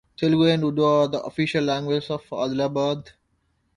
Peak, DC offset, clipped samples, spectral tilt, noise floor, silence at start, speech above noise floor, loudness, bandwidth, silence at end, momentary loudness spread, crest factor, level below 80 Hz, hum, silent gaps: -6 dBFS; under 0.1%; under 0.1%; -6.5 dB/octave; -69 dBFS; 0.2 s; 47 dB; -23 LUFS; 10.5 kHz; 0.65 s; 8 LU; 16 dB; -58 dBFS; none; none